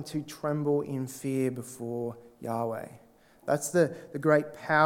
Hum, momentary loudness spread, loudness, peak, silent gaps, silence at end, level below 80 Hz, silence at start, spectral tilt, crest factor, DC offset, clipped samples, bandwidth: none; 13 LU; -30 LUFS; -8 dBFS; none; 0 s; -70 dBFS; 0 s; -6 dB/octave; 22 dB; under 0.1%; under 0.1%; 18 kHz